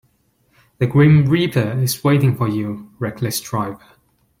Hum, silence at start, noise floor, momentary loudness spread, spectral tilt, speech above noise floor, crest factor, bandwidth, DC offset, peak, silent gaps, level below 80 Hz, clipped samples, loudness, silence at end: none; 0.8 s; -61 dBFS; 14 LU; -6.5 dB/octave; 45 dB; 16 dB; 16.5 kHz; under 0.1%; -4 dBFS; none; -52 dBFS; under 0.1%; -18 LUFS; 0.65 s